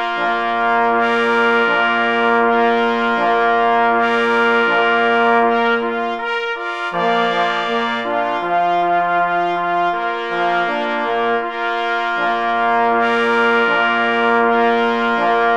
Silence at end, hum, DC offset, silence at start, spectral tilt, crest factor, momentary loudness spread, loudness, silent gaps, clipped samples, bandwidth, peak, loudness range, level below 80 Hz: 0 s; none; 0.4%; 0 s; -5 dB/octave; 14 dB; 5 LU; -16 LUFS; none; under 0.1%; 8.8 kHz; -2 dBFS; 3 LU; -60 dBFS